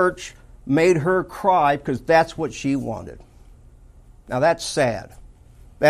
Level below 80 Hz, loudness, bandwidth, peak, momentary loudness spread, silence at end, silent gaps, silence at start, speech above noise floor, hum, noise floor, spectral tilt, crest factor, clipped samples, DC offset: -46 dBFS; -20 LUFS; 14.5 kHz; -4 dBFS; 16 LU; 0 s; none; 0 s; 27 dB; none; -47 dBFS; -5.5 dB/octave; 18 dB; under 0.1%; under 0.1%